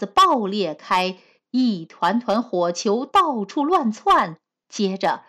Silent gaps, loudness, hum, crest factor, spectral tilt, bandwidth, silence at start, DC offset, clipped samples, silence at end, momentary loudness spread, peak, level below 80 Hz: none; -21 LUFS; none; 12 dB; -4.5 dB/octave; 15.5 kHz; 0 s; under 0.1%; under 0.1%; 0.1 s; 8 LU; -10 dBFS; -58 dBFS